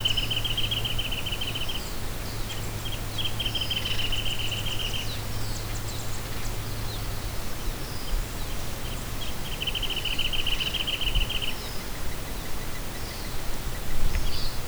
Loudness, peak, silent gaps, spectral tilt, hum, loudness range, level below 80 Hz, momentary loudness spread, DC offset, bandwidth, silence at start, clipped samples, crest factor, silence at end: -30 LUFS; -10 dBFS; none; -3 dB/octave; none; 5 LU; -32 dBFS; 8 LU; under 0.1%; over 20 kHz; 0 s; under 0.1%; 16 dB; 0 s